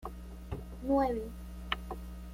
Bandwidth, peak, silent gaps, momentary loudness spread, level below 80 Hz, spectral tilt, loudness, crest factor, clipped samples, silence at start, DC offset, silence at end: 16.5 kHz; -16 dBFS; none; 16 LU; -44 dBFS; -6.5 dB/octave; -36 LUFS; 20 dB; under 0.1%; 0 s; under 0.1%; 0 s